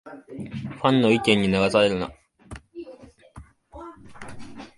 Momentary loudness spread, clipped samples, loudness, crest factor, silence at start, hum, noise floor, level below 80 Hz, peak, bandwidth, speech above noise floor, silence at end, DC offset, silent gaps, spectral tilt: 24 LU; under 0.1%; -21 LUFS; 22 dB; 0.05 s; none; -48 dBFS; -52 dBFS; -2 dBFS; 11.5 kHz; 26 dB; 0.1 s; under 0.1%; none; -5.5 dB/octave